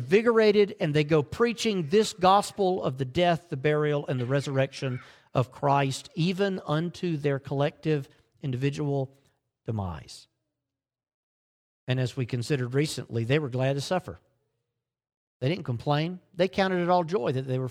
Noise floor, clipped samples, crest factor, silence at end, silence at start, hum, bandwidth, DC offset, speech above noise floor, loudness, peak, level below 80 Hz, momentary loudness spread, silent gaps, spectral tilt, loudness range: -89 dBFS; under 0.1%; 20 dB; 0 s; 0 s; none; 14 kHz; under 0.1%; 63 dB; -27 LUFS; -8 dBFS; -60 dBFS; 11 LU; 11.14-11.87 s, 15.17-15.40 s; -6 dB/octave; 10 LU